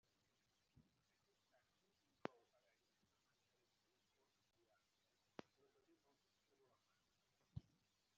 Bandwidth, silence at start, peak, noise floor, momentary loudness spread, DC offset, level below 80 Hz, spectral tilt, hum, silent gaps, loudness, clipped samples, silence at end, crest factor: 7.2 kHz; 0.75 s; -28 dBFS; -86 dBFS; 7 LU; under 0.1%; -86 dBFS; -5.5 dB/octave; none; none; -60 LUFS; under 0.1%; 0.55 s; 40 dB